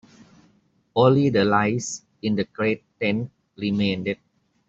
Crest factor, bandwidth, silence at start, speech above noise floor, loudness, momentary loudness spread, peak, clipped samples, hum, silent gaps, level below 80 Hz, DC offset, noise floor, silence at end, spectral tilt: 20 dB; 8 kHz; 0.95 s; 41 dB; -23 LUFS; 12 LU; -4 dBFS; under 0.1%; none; none; -60 dBFS; under 0.1%; -62 dBFS; 0.55 s; -5.5 dB/octave